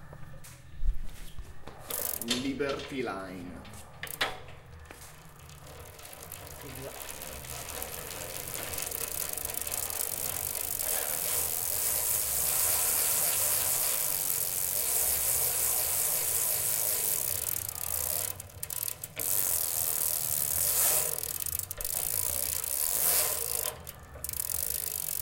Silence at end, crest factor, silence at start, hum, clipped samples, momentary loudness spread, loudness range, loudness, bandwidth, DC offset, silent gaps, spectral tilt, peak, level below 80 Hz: 0 s; 24 dB; 0 s; none; under 0.1%; 20 LU; 14 LU; -28 LUFS; 17.5 kHz; under 0.1%; none; -1 dB/octave; -8 dBFS; -46 dBFS